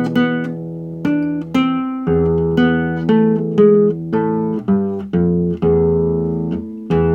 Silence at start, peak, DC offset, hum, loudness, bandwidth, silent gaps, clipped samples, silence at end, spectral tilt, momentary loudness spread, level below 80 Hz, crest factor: 0 s; -2 dBFS; under 0.1%; none; -17 LUFS; 6.8 kHz; none; under 0.1%; 0 s; -9 dB/octave; 8 LU; -38 dBFS; 14 dB